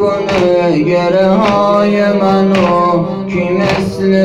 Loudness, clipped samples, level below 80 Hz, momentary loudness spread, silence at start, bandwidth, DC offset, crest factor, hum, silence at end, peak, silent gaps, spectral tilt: -11 LUFS; under 0.1%; -42 dBFS; 4 LU; 0 s; 10.5 kHz; under 0.1%; 10 dB; none; 0 s; 0 dBFS; none; -7 dB/octave